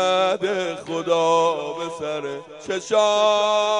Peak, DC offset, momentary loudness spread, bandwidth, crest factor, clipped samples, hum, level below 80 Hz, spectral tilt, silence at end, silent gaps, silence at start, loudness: -6 dBFS; under 0.1%; 11 LU; 10.5 kHz; 16 dB; under 0.1%; none; -70 dBFS; -3 dB/octave; 0 s; none; 0 s; -21 LUFS